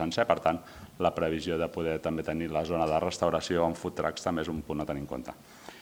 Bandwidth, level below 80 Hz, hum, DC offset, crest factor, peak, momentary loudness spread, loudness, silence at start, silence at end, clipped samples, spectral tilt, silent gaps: over 20 kHz; -56 dBFS; none; under 0.1%; 22 dB; -8 dBFS; 11 LU; -31 LUFS; 0 s; 0 s; under 0.1%; -5.5 dB/octave; none